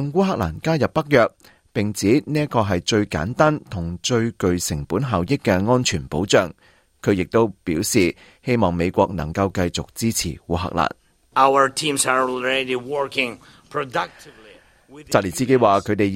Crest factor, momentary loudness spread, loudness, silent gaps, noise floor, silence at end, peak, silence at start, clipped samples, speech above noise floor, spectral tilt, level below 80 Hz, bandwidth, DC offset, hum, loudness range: 20 dB; 8 LU; -20 LUFS; none; -49 dBFS; 0 s; -2 dBFS; 0 s; under 0.1%; 29 dB; -5 dB/octave; -48 dBFS; 16.5 kHz; under 0.1%; none; 2 LU